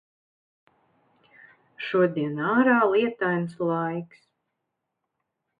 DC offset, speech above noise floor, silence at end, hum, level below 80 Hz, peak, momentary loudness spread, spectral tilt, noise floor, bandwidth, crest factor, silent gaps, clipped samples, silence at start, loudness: under 0.1%; 58 dB; 1.55 s; none; -72 dBFS; -8 dBFS; 14 LU; -8.5 dB/octave; -82 dBFS; 5 kHz; 18 dB; none; under 0.1%; 1.8 s; -24 LUFS